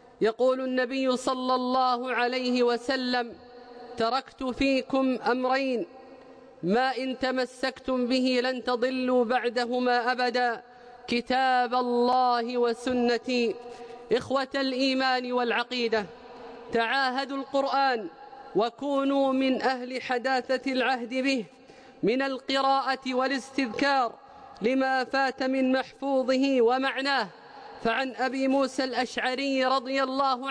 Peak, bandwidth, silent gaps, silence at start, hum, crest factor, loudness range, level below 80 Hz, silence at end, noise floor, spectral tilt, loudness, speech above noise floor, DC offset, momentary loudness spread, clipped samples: -14 dBFS; 10.5 kHz; none; 0.2 s; none; 12 dB; 2 LU; -62 dBFS; 0 s; -49 dBFS; -4 dB/octave; -27 LUFS; 23 dB; under 0.1%; 7 LU; under 0.1%